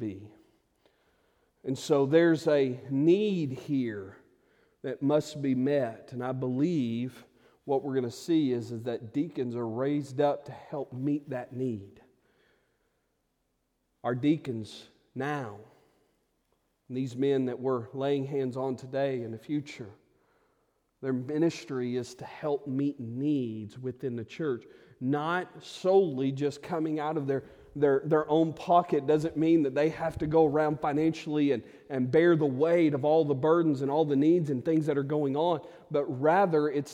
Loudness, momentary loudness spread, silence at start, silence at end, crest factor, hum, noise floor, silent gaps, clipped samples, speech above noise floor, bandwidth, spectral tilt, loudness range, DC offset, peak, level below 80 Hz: -29 LUFS; 13 LU; 0 s; 0 s; 18 dB; none; -77 dBFS; none; under 0.1%; 49 dB; 12 kHz; -7.5 dB/octave; 9 LU; under 0.1%; -10 dBFS; -66 dBFS